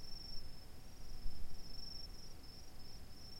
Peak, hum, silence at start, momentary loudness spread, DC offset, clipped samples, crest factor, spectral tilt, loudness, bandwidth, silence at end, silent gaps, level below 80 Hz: -26 dBFS; none; 0 s; 7 LU; under 0.1%; under 0.1%; 14 dB; -4 dB/octave; -54 LUFS; 16 kHz; 0 s; none; -52 dBFS